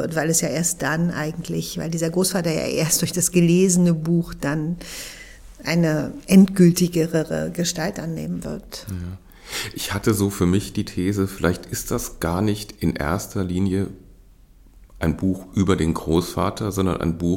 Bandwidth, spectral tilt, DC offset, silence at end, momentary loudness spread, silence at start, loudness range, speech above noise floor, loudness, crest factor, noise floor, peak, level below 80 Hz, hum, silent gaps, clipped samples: 17 kHz; -5 dB/octave; under 0.1%; 0 s; 14 LU; 0 s; 6 LU; 28 dB; -21 LUFS; 18 dB; -49 dBFS; -2 dBFS; -44 dBFS; none; none; under 0.1%